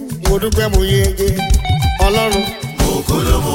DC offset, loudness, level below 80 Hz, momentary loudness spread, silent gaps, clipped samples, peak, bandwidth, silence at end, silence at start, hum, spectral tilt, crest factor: under 0.1%; -15 LUFS; -18 dBFS; 4 LU; none; under 0.1%; 0 dBFS; 17 kHz; 0 s; 0 s; none; -5 dB/octave; 14 dB